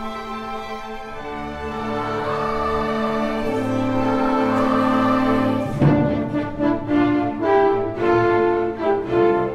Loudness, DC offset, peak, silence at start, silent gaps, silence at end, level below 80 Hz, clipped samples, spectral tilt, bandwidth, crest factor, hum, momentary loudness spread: -20 LUFS; under 0.1%; -2 dBFS; 0 s; none; 0 s; -40 dBFS; under 0.1%; -7.5 dB/octave; 13 kHz; 18 dB; none; 12 LU